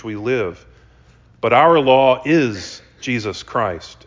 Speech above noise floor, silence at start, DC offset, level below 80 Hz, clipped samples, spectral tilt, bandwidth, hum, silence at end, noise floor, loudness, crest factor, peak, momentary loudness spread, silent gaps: 33 dB; 0.05 s; under 0.1%; -48 dBFS; under 0.1%; -5.5 dB/octave; 7.6 kHz; none; 0.15 s; -49 dBFS; -17 LUFS; 16 dB; -2 dBFS; 15 LU; none